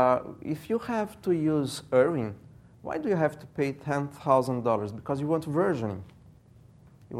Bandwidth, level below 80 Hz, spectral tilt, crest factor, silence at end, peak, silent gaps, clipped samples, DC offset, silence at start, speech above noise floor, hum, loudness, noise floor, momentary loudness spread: 15.5 kHz; -62 dBFS; -7 dB/octave; 20 dB; 0 s; -8 dBFS; none; under 0.1%; under 0.1%; 0 s; 27 dB; none; -28 LUFS; -55 dBFS; 11 LU